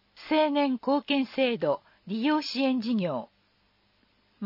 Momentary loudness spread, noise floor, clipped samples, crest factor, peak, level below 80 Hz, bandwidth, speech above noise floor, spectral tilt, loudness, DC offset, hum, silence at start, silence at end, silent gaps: 7 LU; -68 dBFS; under 0.1%; 16 dB; -12 dBFS; -74 dBFS; 5.8 kHz; 41 dB; -6 dB/octave; -27 LUFS; under 0.1%; none; 0.2 s; 0 s; none